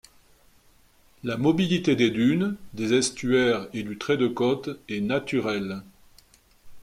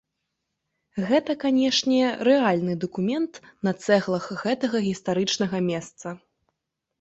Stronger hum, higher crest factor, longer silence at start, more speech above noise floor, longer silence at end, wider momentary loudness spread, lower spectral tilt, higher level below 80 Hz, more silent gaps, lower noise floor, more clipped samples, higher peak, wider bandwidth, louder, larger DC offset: neither; about the same, 16 dB vs 18 dB; first, 1.25 s vs 0.95 s; second, 34 dB vs 58 dB; second, 0 s vs 0.85 s; about the same, 11 LU vs 11 LU; about the same, -5 dB/octave vs -5 dB/octave; first, -58 dBFS vs -66 dBFS; neither; second, -58 dBFS vs -82 dBFS; neither; second, -10 dBFS vs -6 dBFS; first, 15 kHz vs 8.2 kHz; about the same, -25 LUFS vs -24 LUFS; neither